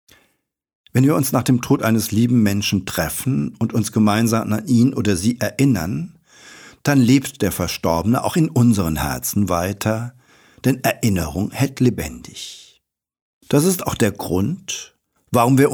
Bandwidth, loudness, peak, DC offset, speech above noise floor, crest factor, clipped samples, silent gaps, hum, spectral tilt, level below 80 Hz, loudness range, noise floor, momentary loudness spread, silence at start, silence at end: over 20 kHz; -19 LUFS; -4 dBFS; under 0.1%; 49 dB; 16 dB; under 0.1%; 13.21-13.41 s; none; -5.5 dB/octave; -44 dBFS; 4 LU; -67 dBFS; 10 LU; 0.95 s; 0 s